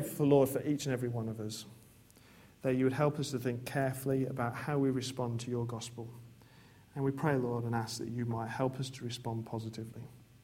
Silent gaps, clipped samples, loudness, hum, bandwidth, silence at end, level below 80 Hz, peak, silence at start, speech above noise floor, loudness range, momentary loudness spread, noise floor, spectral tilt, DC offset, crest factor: none; under 0.1%; -35 LUFS; none; 16.5 kHz; 0.2 s; -66 dBFS; -14 dBFS; 0 s; 26 dB; 3 LU; 15 LU; -60 dBFS; -6.5 dB/octave; under 0.1%; 20 dB